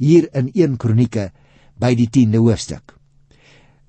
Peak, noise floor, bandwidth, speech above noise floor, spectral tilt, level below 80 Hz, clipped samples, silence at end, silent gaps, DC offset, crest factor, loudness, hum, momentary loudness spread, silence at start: -2 dBFS; -51 dBFS; 8.8 kHz; 36 dB; -7.5 dB/octave; -46 dBFS; under 0.1%; 1.1 s; none; under 0.1%; 16 dB; -16 LUFS; none; 14 LU; 0 s